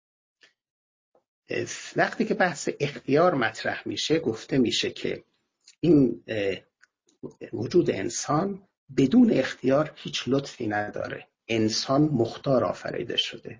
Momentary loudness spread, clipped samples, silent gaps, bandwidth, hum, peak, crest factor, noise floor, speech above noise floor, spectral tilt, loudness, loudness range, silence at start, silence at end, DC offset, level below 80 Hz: 12 LU; under 0.1%; 8.77-8.87 s; 7.6 kHz; none; -8 dBFS; 18 dB; -65 dBFS; 40 dB; -5 dB/octave; -25 LUFS; 2 LU; 1.5 s; 0.05 s; under 0.1%; -60 dBFS